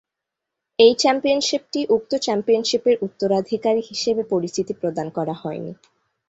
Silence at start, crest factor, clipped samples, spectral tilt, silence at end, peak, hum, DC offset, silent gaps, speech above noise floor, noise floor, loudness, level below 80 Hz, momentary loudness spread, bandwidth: 0.8 s; 20 dB; under 0.1%; -4 dB/octave; 0.55 s; -2 dBFS; none; under 0.1%; none; 63 dB; -84 dBFS; -20 LUFS; -64 dBFS; 11 LU; 8 kHz